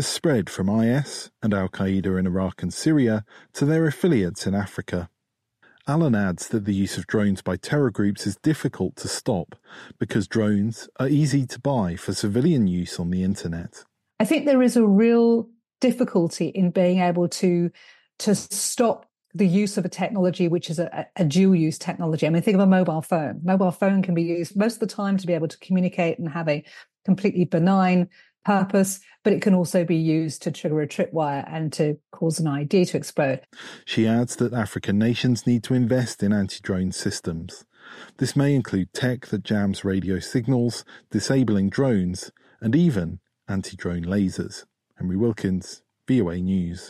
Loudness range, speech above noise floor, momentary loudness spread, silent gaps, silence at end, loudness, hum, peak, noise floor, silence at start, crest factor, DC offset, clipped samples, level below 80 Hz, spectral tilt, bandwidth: 4 LU; 57 dB; 10 LU; none; 0 s; -23 LUFS; none; -6 dBFS; -79 dBFS; 0 s; 16 dB; under 0.1%; under 0.1%; -56 dBFS; -6.5 dB/octave; 13 kHz